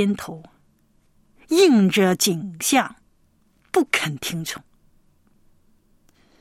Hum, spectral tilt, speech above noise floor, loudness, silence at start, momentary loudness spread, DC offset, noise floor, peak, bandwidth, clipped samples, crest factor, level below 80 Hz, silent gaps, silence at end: none; -4 dB/octave; 41 dB; -20 LUFS; 0 s; 16 LU; under 0.1%; -61 dBFS; -4 dBFS; 16.5 kHz; under 0.1%; 18 dB; -62 dBFS; none; 1.8 s